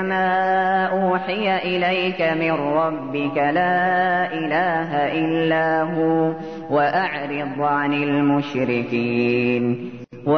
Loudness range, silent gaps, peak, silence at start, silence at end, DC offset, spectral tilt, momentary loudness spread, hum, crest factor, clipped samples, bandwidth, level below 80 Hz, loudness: 1 LU; none; -8 dBFS; 0 s; 0 s; 0.3%; -8 dB/octave; 5 LU; none; 12 dB; under 0.1%; 6.4 kHz; -60 dBFS; -20 LUFS